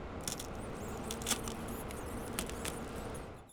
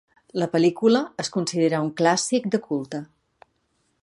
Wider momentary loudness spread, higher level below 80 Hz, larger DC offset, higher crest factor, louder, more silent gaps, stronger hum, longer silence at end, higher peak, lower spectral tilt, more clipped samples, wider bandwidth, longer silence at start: about the same, 8 LU vs 10 LU; first, -50 dBFS vs -70 dBFS; neither; about the same, 22 dB vs 20 dB; second, -40 LUFS vs -23 LUFS; neither; neither; second, 0 s vs 1 s; second, -18 dBFS vs -4 dBFS; about the same, -3.5 dB/octave vs -4.5 dB/octave; neither; first, over 20 kHz vs 11.5 kHz; second, 0 s vs 0.35 s